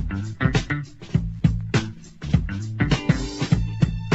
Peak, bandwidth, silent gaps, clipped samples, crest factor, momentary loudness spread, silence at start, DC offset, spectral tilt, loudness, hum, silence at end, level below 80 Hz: -4 dBFS; 8.2 kHz; none; under 0.1%; 18 dB; 8 LU; 0 s; under 0.1%; -6.5 dB/octave; -24 LUFS; none; 0 s; -32 dBFS